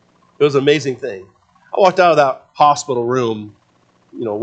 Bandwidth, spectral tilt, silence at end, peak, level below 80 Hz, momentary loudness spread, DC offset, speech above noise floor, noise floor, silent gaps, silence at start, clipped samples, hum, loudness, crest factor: 8.8 kHz; -5 dB/octave; 0 s; 0 dBFS; -64 dBFS; 15 LU; under 0.1%; 41 dB; -56 dBFS; none; 0.4 s; under 0.1%; none; -15 LUFS; 16 dB